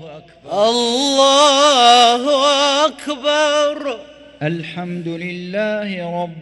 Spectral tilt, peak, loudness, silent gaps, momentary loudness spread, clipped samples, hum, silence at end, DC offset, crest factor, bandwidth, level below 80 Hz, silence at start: -3 dB/octave; 0 dBFS; -14 LUFS; none; 15 LU; under 0.1%; none; 0 s; under 0.1%; 16 dB; 12 kHz; -60 dBFS; 0 s